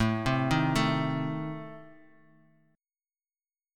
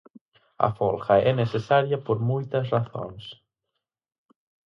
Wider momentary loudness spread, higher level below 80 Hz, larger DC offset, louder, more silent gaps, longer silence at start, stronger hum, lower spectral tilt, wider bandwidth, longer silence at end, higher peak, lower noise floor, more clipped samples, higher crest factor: about the same, 17 LU vs 15 LU; first, -50 dBFS vs -58 dBFS; neither; second, -29 LUFS vs -24 LUFS; neither; second, 0 s vs 0.6 s; neither; second, -6 dB/octave vs -8 dB/octave; first, 16 kHz vs 6.4 kHz; first, 1.8 s vs 1.35 s; second, -12 dBFS vs -4 dBFS; first, under -90 dBFS vs -83 dBFS; neither; about the same, 20 dB vs 22 dB